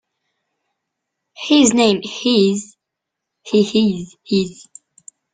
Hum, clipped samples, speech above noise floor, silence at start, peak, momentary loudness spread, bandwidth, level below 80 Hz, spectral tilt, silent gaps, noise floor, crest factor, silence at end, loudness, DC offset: none; under 0.1%; 65 dB; 1.4 s; 0 dBFS; 14 LU; 9.6 kHz; -58 dBFS; -4 dB/octave; none; -81 dBFS; 18 dB; 0.8 s; -16 LUFS; under 0.1%